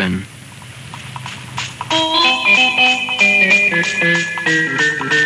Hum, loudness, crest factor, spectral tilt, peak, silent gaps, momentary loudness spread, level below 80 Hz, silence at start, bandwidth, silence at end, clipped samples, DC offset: none; -12 LUFS; 14 dB; -2.5 dB/octave; -2 dBFS; none; 19 LU; -54 dBFS; 0 s; 13 kHz; 0 s; under 0.1%; under 0.1%